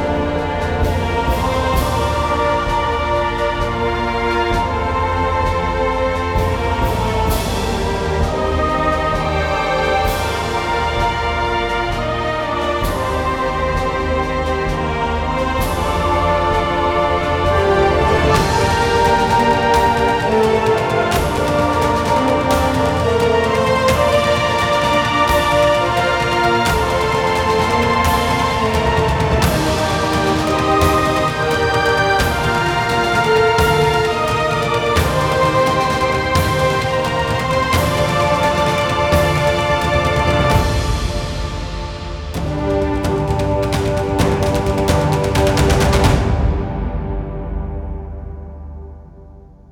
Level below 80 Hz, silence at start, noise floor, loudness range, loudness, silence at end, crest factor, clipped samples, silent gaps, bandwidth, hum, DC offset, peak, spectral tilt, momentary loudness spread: -26 dBFS; 0 s; -40 dBFS; 4 LU; -16 LUFS; 0.25 s; 16 dB; under 0.1%; none; 19 kHz; none; under 0.1%; 0 dBFS; -5 dB/octave; 5 LU